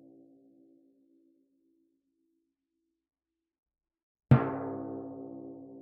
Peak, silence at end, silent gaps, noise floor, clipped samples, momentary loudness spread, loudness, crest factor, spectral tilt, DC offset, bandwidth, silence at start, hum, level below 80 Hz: -8 dBFS; 0 s; none; -84 dBFS; under 0.1%; 20 LU; -30 LUFS; 28 dB; -8 dB/octave; under 0.1%; 3.9 kHz; 4.3 s; none; -62 dBFS